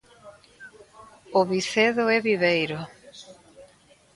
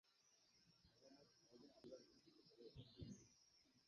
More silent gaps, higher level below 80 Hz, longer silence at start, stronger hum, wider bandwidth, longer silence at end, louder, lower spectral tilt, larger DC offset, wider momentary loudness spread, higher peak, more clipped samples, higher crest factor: neither; first, -66 dBFS vs -80 dBFS; first, 0.25 s vs 0.05 s; neither; first, 11.5 kHz vs 7 kHz; first, 0.5 s vs 0 s; first, -23 LUFS vs -64 LUFS; second, -4.5 dB/octave vs -6 dB/octave; neither; first, 24 LU vs 6 LU; first, -6 dBFS vs -44 dBFS; neither; about the same, 20 dB vs 22 dB